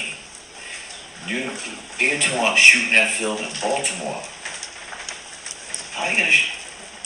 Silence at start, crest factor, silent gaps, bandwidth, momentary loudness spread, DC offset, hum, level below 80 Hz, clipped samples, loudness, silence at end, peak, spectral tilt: 0 s; 22 dB; none; 16 kHz; 21 LU; under 0.1%; none; -60 dBFS; under 0.1%; -17 LUFS; 0 s; 0 dBFS; -0.5 dB/octave